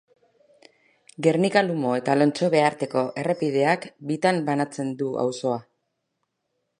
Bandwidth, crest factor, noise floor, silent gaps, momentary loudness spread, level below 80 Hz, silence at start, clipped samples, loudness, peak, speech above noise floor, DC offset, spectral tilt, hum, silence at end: 11 kHz; 20 dB; -77 dBFS; none; 8 LU; -74 dBFS; 1.2 s; under 0.1%; -23 LUFS; -6 dBFS; 55 dB; under 0.1%; -6 dB/octave; none; 1.2 s